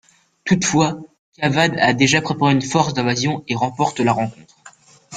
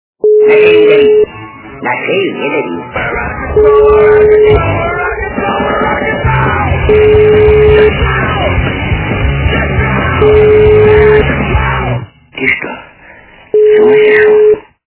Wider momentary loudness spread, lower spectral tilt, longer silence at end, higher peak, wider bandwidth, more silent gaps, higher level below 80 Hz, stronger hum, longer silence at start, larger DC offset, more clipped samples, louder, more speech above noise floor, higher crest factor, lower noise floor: second, 7 LU vs 10 LU; second, -4.5 dB/octave vs -10.5 dB/octave; second, 0 s vs 0.3 s; about the same, -2 dBFS vs 0 dBFS; first, 9.8 kHz vs 4 kHz; first, 1.19-1.32 s vs none; second, -54 dBFS vs -20 dBFS; neither; first, 0.45 s vs 0.25 s; neither; second, under 0.1% vs 1%; second, -18 LUFS vs -8 LUFS; about the same, 29 dB vs 29 dB; first, 18 dB vs 8 dB; first, -47 dBFS vs -36 dBFS